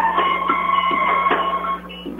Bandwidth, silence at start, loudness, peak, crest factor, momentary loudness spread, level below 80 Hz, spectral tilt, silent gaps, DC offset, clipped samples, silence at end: 12.5 kHz; 0 s; -19 LUFS; -4 dBFS; 16 dB; 7 LU; -48 dBFS; -5.5 dB/octave; none; under 0.1%; under 0.1%; 0 s